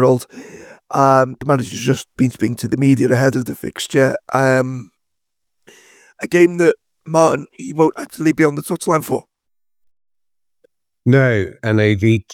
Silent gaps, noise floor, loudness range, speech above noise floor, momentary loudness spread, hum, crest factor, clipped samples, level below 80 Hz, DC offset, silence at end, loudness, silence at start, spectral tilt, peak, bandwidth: none; -85 dBFS; 4 LU; 70 dB; 11 LU; none; 16 dB; under 0.1%; -56 dBFS; under 0.1%; 0 s; -16 LUFS; 0 s; -6.5 dB/octave; 0 dBFS; 17 kHz